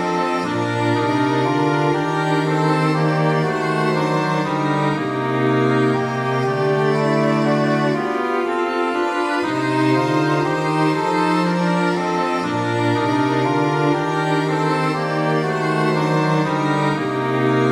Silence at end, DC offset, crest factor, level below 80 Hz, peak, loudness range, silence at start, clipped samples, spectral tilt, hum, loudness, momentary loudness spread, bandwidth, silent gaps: 0 s; under 0.1%; 14 dB; -60 dBFS; -6 dBFS; 1 LU; 0 s; under 0.1%; -6.5 dB/octave; none; -19 LUFS; 3 LU; 12.5 kHz; none